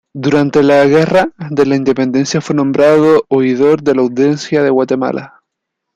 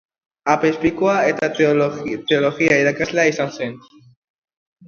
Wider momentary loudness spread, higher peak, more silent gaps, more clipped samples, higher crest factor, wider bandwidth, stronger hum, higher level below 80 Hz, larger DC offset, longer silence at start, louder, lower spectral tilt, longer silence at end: second, 6 LU vs 9 LU; about the same, 0 dBFS vs 0 dBFS; neither; neither; second, 10 dB vs 20 dB; first, 9.8 kHz vs 7.4 kHz; neither; about the same, -52 dBFS vs -54 dBFS; neither; second, 0.15 s vs 0.45 s; first, -12 LUFS vs -18 LUFS; first, -6.5 dB/octave vs -5 dB/octave; second, 0.7 s vs 1.1 s